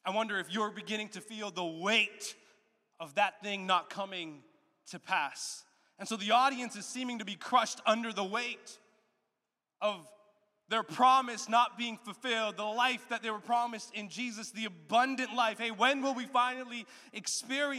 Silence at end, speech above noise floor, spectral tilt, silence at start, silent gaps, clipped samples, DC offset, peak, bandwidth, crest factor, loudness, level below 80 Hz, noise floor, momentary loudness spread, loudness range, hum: 0 s; 55 dB; -2.5 dB/octave; 0.05 s; none; under 0.1%; under 0.1%; -14 dBFS; 15 kHz; 20 dB; -32 LUFS; under -90 dBFS; -88 dBFS; 13 LU; 4 LU; none